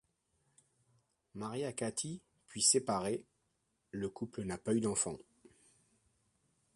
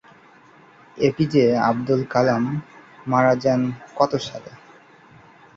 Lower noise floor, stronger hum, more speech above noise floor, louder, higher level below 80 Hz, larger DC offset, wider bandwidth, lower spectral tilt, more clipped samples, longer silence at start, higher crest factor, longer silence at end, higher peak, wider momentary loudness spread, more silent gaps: first, -81 dBFS vs -50 dBFS; neither; first, 45 dB vs 31 dB; second, -36 LUFS vs -20 LUFS; second, -70 dBFS vs -58 dBFS; neither; first, 11.5 kHz vs 7.6 kHz; second, -3.5 dB/octave vs -7 dB/octave; neither; first, 1.35 s vs 0.95 s; first, 26 dB vs 18 dB; first, 1.55 s vs 1 s; second, -14 dBFS vs -4 dBFS; first, 20 LU vs 12 LU; neither